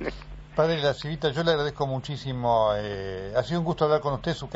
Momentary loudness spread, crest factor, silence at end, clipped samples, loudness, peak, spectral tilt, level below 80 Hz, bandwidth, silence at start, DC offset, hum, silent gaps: 9 LU; 18 dB; 0 s; under 0.1%; -26 LUFS; -8 dBFS; -4.5 dB/octave; -46 dBFS; 8 kHz; 0 s; under 0.1%; none; none